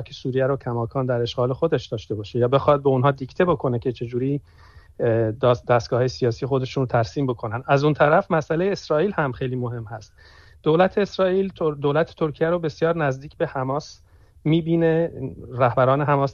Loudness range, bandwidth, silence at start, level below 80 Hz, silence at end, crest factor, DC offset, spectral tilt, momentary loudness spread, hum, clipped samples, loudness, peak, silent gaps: 2 LU; 7.2 kHz; 0 s; -50 dBFS; 0 s; 18 dB; under 0.1%; -7.5 dB/octave; 9 LU; none; under 0.1%; -22 LUFS; -4 dBFS; none